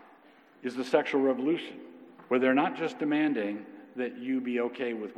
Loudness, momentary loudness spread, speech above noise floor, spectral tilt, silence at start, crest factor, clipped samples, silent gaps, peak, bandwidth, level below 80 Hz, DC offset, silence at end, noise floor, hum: -30 LUFS; 15 LU; 29 dB; -6 dB/octave; 0.6 s; 22 dB; under 0.1%; none; -8 dBFS; 10 kHz; under -90 dBFS; under 0.1%; 0 s; -58 dBFS; none